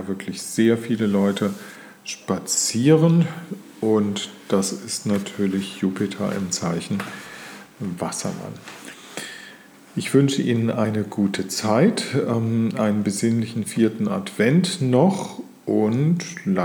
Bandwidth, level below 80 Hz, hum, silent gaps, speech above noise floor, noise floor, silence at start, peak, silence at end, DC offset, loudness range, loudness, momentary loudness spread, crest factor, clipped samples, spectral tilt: 19.5 kHz; -68 dBFS; none; none; 24 dB; -45 dBFS; 0 s; -4 dBFS; 0 s; under 0.1%; 7 LU; -22 LUFS; 16 LU; 18 dB; under 0.1%; -5.5 dB/octave